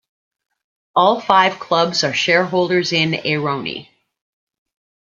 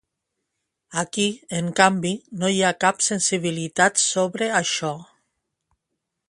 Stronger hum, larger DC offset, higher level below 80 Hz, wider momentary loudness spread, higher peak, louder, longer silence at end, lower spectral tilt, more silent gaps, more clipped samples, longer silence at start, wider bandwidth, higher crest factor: neither; neither; about the same, -64 dBFS vs -66 dBFS; about the same, 8 LU vs 9 LU; about the same, 0 dBFS vs 0 dBFS; first, -16 LUFS vs -21 LUFS; about the same, 1.3 s vs 1.25 s; about the same, -4 dB/octave vs -3 dB/octave; neither; neither; about the same, 0.95 s vs 0.9 s; second, 7.6 kHz vs 11.5 kHz; about the same, 20 dB vs 24 dB